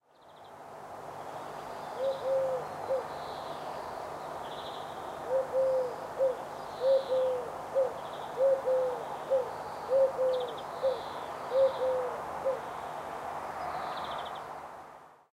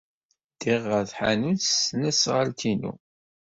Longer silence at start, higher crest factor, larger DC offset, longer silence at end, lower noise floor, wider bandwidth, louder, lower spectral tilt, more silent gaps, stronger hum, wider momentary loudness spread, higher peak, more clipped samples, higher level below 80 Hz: second, 0.25 s vs 0.6 s; about the same, 16 dB vs 18 dB; neither; second, 0.15 s vs 0.5 s; first, -54 dBFS vs -47 dBFS; first, 15 kHz vs 8 kHz; second, -33 LUFS vs -24 LUFS; about the same, -4.5 dB/octave vs -3.5 dB/octave; neither; neither; first, 14 LU vs 7 LU; second, -16 dBFS vs -10 dBFS; neither; second, -68 dBFS vs -60 dBFS